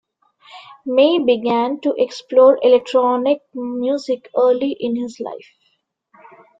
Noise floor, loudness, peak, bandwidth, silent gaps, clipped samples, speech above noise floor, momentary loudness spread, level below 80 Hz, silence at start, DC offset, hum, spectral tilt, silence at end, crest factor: -66 dBFS; -17 LUFS; -2 dBFS; 7.8 kHz; none; under 0.1%; 50 dB; 14 LU; -66 dBFS; 0.55 s; under 0.1%; none; -5 dB/octave; 1.2 s; 16 dB